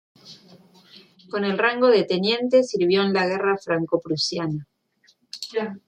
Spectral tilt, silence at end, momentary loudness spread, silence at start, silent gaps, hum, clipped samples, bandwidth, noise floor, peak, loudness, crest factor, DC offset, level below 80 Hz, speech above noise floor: -5 dB/octave; 0.1 s; 11 LU; 0.25 s; none; none; under 0.1%; 10 kHz; -62 dBFS; -6 dBFS; -22 LUFS; 18 dB; under 0.1%; -68 dBFS; 41 dB